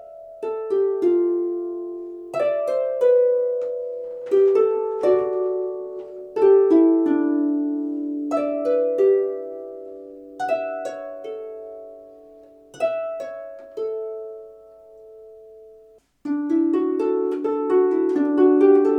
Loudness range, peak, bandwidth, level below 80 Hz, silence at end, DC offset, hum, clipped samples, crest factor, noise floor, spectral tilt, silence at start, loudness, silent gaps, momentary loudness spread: 12 LU; -6 dBFS; 8 kHz; -70 dBFS; 0 s; under 0.1%; none; under 0.1%; 16 dB; -52 dBFS; -6.5 dB/octave; 0 s; -21 LUFS; none; 18 LU